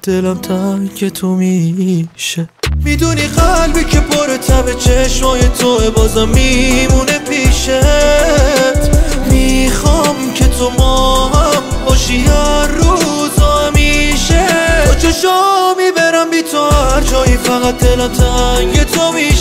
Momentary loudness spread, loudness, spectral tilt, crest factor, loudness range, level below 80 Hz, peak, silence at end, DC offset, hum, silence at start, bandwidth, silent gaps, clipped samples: 5 LU; -11 LUFS; -4.5 dB/octave; 10 dB; 3 LU; -14 dBFS; 0 dBFS; 0 s; under 0.1%; none; 0.05 s; 16.5 kHz; none; under 0.1%